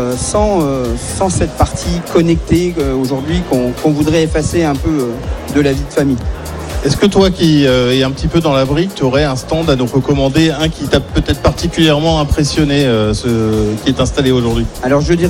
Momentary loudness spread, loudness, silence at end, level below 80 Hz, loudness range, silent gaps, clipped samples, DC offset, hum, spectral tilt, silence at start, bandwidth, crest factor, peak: 6 LU; -13 LUFS; 0 s; -24 dBFS; 2 LU; none; under 0.1%; under 0.1%; none; -5.5 dB/octave; 0 s; 16.5 kHz; 12 dB; 0 dBFS